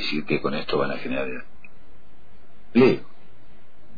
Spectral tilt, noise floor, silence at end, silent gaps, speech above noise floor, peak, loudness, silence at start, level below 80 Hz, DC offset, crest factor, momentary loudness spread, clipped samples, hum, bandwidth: -7.5 dB/octave; -53 dBFS; 0.95 s; none; 30 dB; -6 dBFS; -23 LUFS; 0 s; -52 dBFS; 4%; 20 dB; 11 LU; under 0.1%; none; 5 kHz